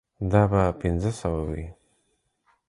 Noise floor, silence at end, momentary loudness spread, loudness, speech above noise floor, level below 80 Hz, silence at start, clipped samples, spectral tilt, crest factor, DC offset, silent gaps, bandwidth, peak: -72 dBFS; 0.95 s; 13 LU; -25 LUFS; 48 dB; -38 dBFS; 0.2 s; under 0.1%; -8 dB/octave; 20 dB; under 0.1%; none; 11.5 kHz; -6 dBFS